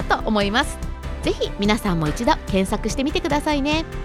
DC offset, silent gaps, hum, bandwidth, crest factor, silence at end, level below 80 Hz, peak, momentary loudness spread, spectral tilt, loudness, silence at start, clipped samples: under 0.1%; none; none; 15.5 kHz; 18 dB; 0 s; -30 dBFS; -4 dBFS; 6 LU; -5 dB/octave; -22 LUFS; 0 s; under 0.1%